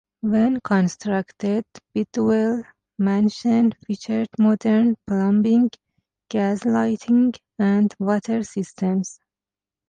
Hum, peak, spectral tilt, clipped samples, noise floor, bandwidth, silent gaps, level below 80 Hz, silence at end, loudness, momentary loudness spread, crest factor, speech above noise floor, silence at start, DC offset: none; -8 dBFS; -7 dB/octave; under 0.1%; under -90 dBFS; 9.2 kHz; none; -60 dBFS; 0.75 s; -21 LUFS; 8 LU; 12 dB; over 70 dB; 0.25 s; under 0.1%